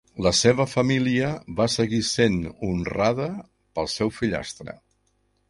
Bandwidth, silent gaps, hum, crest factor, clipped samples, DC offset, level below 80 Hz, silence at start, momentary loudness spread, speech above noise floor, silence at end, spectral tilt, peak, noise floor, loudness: 11.5 kHz; none; none; 20 dB; under 0.1%; under 0.1%; -46 dBFS; 0.15 s; 13 LU; 45 dB; 0.75 s; -4.5 dB/octave; -4 dBFS; -68 dBFS; -23 LUFS